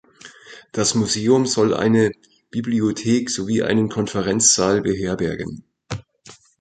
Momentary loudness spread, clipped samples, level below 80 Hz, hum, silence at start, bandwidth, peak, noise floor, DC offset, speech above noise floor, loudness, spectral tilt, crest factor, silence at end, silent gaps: 17 LU; under 0.1%; -50 dBFS; none; 0.25 s; 9.4 kHz; -2 dBFS; -48 dBFS; under 0.1%; 29 dB; -19 LUFS; -4 dB/octave; 18 dB; 0.25 s; none